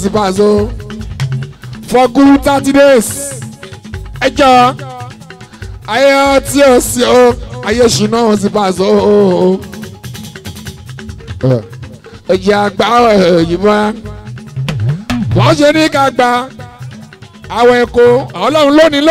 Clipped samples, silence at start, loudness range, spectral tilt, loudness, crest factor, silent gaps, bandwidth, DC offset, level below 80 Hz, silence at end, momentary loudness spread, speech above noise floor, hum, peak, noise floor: under 0.1%; 0 s; 4 LU; -5 dB/octave; -10 LUFS; 10 dB; none; 16 kHz; under 0.1%; -34 dBFS; 0 s; 20 LU; 24 dB; none; 0 dBFS; -33 dBFS